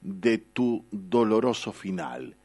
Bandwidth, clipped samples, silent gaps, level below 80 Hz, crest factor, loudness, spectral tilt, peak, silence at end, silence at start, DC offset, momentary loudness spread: 11.5 kHz; under 0.1%; none; -66 dBFS; 18 dB; -27 LUFS; -6 dB/octave; -10 dBFS; 0.1 s; 0 s; under 0.1%; 10 LU